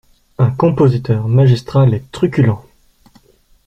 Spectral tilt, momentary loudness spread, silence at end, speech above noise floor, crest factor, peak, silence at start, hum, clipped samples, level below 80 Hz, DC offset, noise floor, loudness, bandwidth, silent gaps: -9 dB/octave; 5 LU; 1.05 s; 38 dB; 14 dB; -2 dBFS; 0.4 s; none; under 0.1%; -44 dBFS; under 0.1%; -50 dBFS; -14 LUFS; 8.2 kHz; none